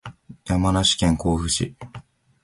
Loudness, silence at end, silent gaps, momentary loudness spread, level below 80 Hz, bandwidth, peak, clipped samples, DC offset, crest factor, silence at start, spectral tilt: -21 LUFS; 0.4 s; none; 22 LU; -36 dBFS; 11.5 kHz; -6 dBFS; under 0.1%; under 0.1%; 16 dB; 0.05 s; -4.5 dB/octave